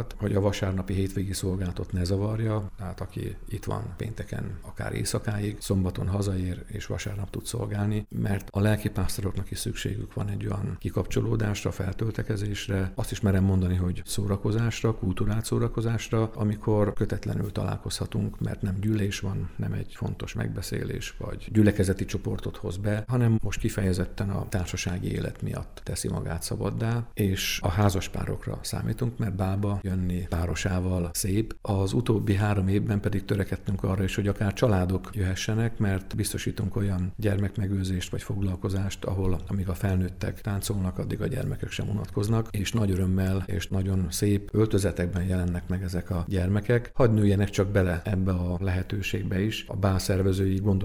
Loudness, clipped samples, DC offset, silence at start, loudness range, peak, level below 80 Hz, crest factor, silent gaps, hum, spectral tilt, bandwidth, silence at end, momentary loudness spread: -28 LUFS; under 0.1%; under 0.1%; 0 s; 4 LU; -8 dBFS; -40 dBFS; 18 dB; none; none; -6 dB/octave; 15 kHz; 0 s; 8 LU